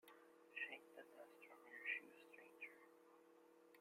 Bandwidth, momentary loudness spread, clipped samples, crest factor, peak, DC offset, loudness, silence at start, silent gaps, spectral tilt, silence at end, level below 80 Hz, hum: 16 kHz; 20 LU; under 0.1%; 24 dB; -34 dBFS; under 0.1%; -54 LUFS; 0.05 s; none; -2 dB/octave; 0 s; under -90 dBFS; none